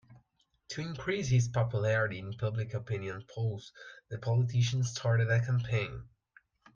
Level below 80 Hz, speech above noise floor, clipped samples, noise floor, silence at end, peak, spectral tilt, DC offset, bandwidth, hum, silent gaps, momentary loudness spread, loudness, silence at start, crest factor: -60 dBFS; 42 dB; under 0.1%; -73 dBFS; 0.7 s; -16 dBFS; -6 dB/octave; under 0.1%; 7.4 kHz; none; none; 13 LU; -32 LUFS; 0.1 s; 16 dB